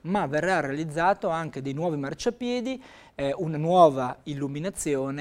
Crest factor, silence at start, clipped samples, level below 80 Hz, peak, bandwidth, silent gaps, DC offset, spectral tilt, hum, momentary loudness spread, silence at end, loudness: 20 dB; 0.05 s; under 0.1%; -56 dBFS; -6 dBFS; 15.5 kHz; none; under 0.1%; -5.5 dB/octave; none; 13 LU; 0 s; -26 LUFS